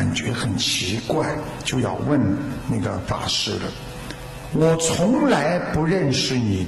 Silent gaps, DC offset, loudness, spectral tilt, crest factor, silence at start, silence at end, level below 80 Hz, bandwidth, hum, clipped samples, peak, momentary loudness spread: none; under 0.1%; -21 LUFS; -4.5 dB/octave; 16 dB; 0 s; 0 s; -42 dBFS; 13 kHz; none; under 0.1%; -6 dBFS; 10 LU